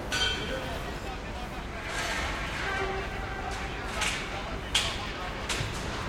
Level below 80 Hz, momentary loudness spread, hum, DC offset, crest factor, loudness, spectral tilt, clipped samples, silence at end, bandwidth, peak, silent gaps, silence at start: -40 dBFS; 9 LU; none; under 0.1%; 20 dB; -32 LUFS; -3 dB/octave; under 0.1%; 0 s; 16.5 kHz; -12 dBFS; none; 0 s